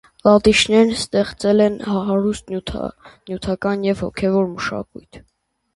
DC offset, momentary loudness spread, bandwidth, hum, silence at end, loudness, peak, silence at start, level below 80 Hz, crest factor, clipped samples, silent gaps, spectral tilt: under 0.1%; 15 LU; 11.5 kHz; none; 0.6 s; -18 LUFS; 0 dBFS; 0.25 s; -44 dBFS; 18 dB; under 0.1%; none; -5 dB/octave